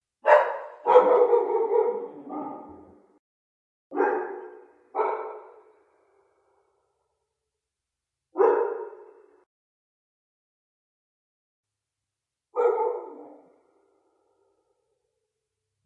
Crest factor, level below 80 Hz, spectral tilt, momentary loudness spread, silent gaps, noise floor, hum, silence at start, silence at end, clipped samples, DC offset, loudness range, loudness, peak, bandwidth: 24 dB; -86 dBFS; -5.5 dB/octave; 20 LU; 3.19-3.90 s, 9.46-11.63 s; -87 dBFS; none; 0.25 s; 2.55 s; under 0.1%; under 0.1%; 13 LU; -24 LUFS; -4 dBFS; 5.2 kHz